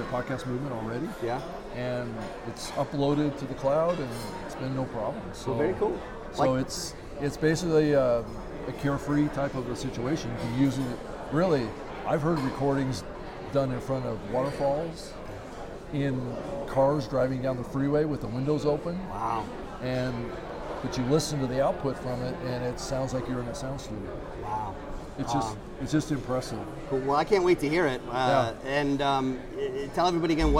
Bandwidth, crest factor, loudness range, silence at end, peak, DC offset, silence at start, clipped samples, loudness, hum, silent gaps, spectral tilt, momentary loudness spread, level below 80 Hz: 16.5 kHz; 18 dB; 5 LU; 0 s; -10 dBFS; under 0.1%; 0 s; under 0.1%; -29 LUFS; none; none; -6 dB/octave; 12 LU; -44 dBFS